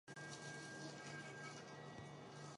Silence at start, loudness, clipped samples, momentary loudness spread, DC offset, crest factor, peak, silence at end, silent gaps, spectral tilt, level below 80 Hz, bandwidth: 0.05 s; -53 LUFS; under 0.1%; 4 LU; under 0.1%; 14 dB; -40 dBFS; 0 s; none; -4 dB/octave; -82 dBFS; 11.5 kHz